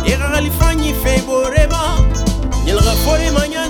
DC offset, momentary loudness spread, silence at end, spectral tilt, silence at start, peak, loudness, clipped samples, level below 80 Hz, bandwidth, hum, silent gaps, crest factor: under 0.1%; 3 LU; 0 s; -5 dB/octave; 0 s; 0 dBFS; -15 LUFS; under 0.1%; -16 dBFS; over 20 kHz; none; none; 14 dB